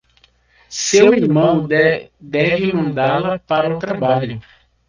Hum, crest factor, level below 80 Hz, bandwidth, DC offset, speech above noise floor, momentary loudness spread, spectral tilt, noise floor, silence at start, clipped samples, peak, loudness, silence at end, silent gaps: none; 16 dB; -52 dBFS; 10 kHz; under 0.1%; 40 dB; 12 LU; -5 dB/octave; -55 dBFS; 0.7 s; under 0.1%; 0 dBFS; -16 LUFS; 0.5 s; none